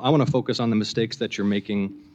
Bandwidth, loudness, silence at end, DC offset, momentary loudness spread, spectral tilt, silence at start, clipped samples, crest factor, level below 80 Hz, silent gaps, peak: 8.2 kHz; -24 LUFS; 0.1 s; under 0.1%; 6 LU; -6.5 dB/octave; 0 s; under 0.1%; 16 dB; -64 dBFS; none; -6 dBFS